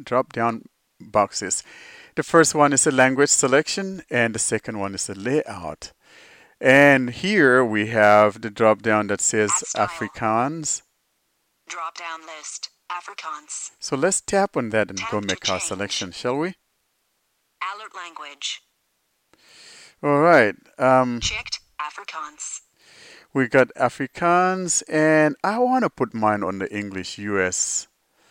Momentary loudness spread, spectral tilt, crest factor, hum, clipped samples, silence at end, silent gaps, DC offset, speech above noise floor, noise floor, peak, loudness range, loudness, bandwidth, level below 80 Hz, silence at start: 17 LU; -3.5 dB/octave; 20 dB; none; under 0.1%; 0.45 s; none; under 0.1%; 49 dB; -71 dBFS; -2 dBFS; 11 LU; -20 LUFS; 16.5 kHz; -56 dBFS; 0 s